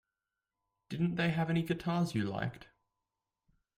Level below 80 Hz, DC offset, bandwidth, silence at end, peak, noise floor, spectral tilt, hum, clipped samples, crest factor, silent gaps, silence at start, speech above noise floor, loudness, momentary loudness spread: -66 dBFS; under 0.1%; 15.5 kHz; 1.15 s; -18 dBFS; under -90 dBFS; -7 dB/octave; none; under 0.1%; 18 dB; none; 0.9 s; over 57 dB; -34 LUFS; 8 LU